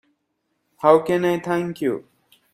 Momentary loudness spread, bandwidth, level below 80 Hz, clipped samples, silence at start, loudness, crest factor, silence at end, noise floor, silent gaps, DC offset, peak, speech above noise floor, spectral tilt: 9 LU; 15 kHz; -64 dBFS; under 0.1%; 0.8 s; -20 LUFS; 22 dB; 0.55 s; -73 dBFS; none; under 0.1%; 0 dBFS; 54 dB; -7 dB/octave